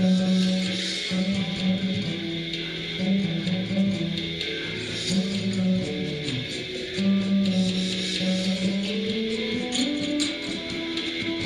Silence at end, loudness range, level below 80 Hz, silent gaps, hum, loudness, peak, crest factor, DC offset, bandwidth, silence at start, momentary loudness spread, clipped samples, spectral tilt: 0 s; 2 LU; -54 dBFS; none; none; -26 LUFS; -10 dBFS; 14 dB; under 0.1%; 11 kHz; 0 s; 6 LU; under 0.1%; -5 dB/octave